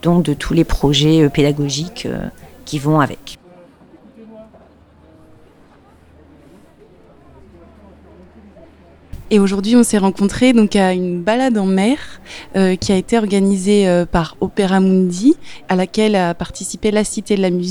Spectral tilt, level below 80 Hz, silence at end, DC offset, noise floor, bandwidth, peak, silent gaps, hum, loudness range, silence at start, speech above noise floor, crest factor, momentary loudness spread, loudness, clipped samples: -5.5 dB/octave; -36 dBFS; 0 s; under 0.1%; -47 dBFS; 19 kHz; 0 dBFS; none; none; 9 LU; 0.05 s; 32 dB; 16 dB; 11 LU; -15 LUFS; under 0.1%